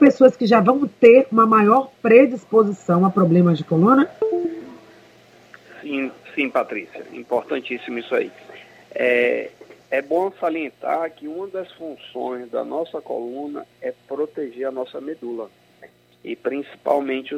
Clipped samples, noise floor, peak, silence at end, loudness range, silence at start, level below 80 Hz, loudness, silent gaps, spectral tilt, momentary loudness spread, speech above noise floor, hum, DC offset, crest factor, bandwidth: under 0.1%; -50 dBFS; 0 dBFS; 0 s; 14 LU; 0 s; -68 dBFS; -19 LUFS; none; -8 dB/octave; 18 LU; 31 dB; none; under 0.1%; 20 dB; 8 kHz